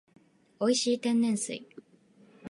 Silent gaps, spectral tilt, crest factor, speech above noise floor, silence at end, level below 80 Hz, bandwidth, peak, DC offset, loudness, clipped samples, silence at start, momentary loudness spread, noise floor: none; -3.5 dB/octave; 18 dB; 33 dB; 0.05 s; -78 dBFS; 11.5 kHz; -14 dBFS; under 0.1%; -28 LUFS; under 0.1%; 0.6 s; 13 LU; -61 dBFS